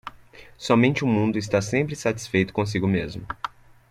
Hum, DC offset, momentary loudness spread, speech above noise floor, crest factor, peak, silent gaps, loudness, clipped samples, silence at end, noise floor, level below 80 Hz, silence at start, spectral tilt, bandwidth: none; under 0.1%; 14 LU; 25 dB; 20 dB; -4 dBFS; none; -23 LUFS; under 0.1%; 0.45 s; -48 dBFS; -52 dBFS; 0.05 s; -6 dB/octave; 14 kHz